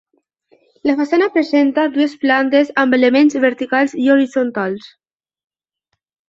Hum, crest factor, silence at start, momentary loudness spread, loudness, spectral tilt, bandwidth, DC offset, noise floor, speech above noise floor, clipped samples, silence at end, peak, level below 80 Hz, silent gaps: none; 14 dB; 0.85 s; 7 LU; -15 LUFS; -5 dB/octave; 7.6 kHz; under 0.1%; -73 dBFS; 59 dB; under 0.1%; 1.4 s; -2 dBFS; -64 dBFS; none